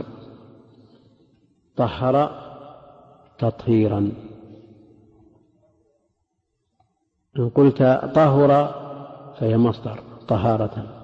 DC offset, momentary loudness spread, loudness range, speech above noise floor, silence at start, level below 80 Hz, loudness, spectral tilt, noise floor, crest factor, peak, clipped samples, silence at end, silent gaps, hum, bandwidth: under 0.1%; 23 LU; 8 LU; 55 dB; 0 s; -54 dBFS; -20 LUFS; -10 dB/octave; -74 dBFS; 16 dB; -6 dBFS; under 0.1%; 0.05 s; none; none; 6.2 kHz